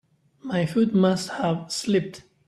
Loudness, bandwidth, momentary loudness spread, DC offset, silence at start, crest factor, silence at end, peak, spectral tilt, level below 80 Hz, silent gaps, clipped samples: -24 LUFS; 13 kHz; 10 LU; under 0.1%; 0.45 s; 18 dB; 0.25 s; -8 dBFS; -6 dB/octave; -62 dBFS; none; under 0.1%